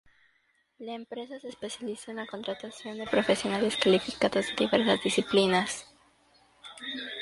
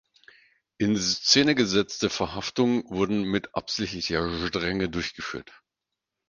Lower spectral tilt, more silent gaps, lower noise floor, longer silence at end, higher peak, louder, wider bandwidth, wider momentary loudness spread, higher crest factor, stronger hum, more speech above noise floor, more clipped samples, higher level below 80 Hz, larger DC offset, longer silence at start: about the same, -4 dB/octave vs -3.5 dB/octave; neither; second, -71 dBFS vs -86 dBFS; second, 0 s vs 0.9 s; about the same, -8 dBFS vs -6 dBFS; second, -28 LUFS vs -25 LUFS; first, 11.5 kHz vs 10 kHz; first, 16 LU vs 11 LU; about the same, 22 dB vs 20 dB; neither; second, 42 dB vs 60 dB; neither; second, -66 dBFS vs -50 dBFS; neither; about the same, 0.8 s vs 0.8 s